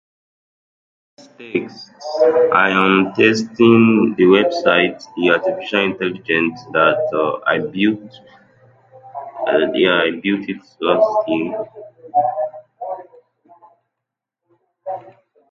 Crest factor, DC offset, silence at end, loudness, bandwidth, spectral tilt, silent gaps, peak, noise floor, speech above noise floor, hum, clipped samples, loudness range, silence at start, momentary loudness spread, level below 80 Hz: 18 dB; under 0.1%; 0.5 s; -16 LUFS; 7.6 kHz; -6 dB/octave; none; 0 dBFS; -82 dBFS; 66 dB; none; under 0.1%; 11 LU; 1.4 s; 18 LU; -62 dBFS